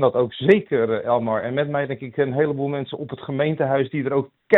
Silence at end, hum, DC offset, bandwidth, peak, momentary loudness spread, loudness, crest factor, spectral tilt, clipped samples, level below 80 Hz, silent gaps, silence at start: 0 s; none; under 0.1%; 4.2 kHz; -2 dBFS; 9 LU; -22 LUFS; 18 dB; -9 dB/octave; under 0.1%; -62 dBFS; none; 0 s